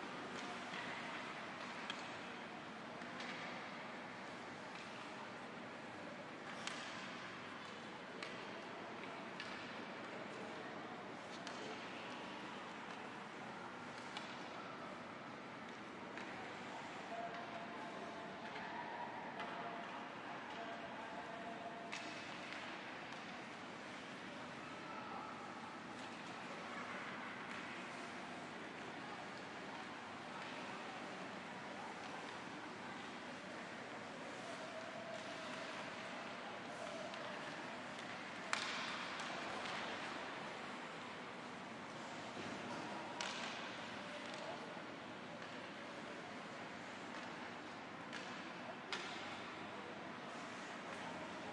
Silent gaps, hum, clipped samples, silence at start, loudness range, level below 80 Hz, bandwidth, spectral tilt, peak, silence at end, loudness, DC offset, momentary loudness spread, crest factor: none; none; under 0.1%; 0 s; 4 LU; -84 dBFS; 11 kHz; -3.5 dB/octave; -18 dBFS; 0 s; -48 LUFS; under 0.1%; 4 LU; 30 dB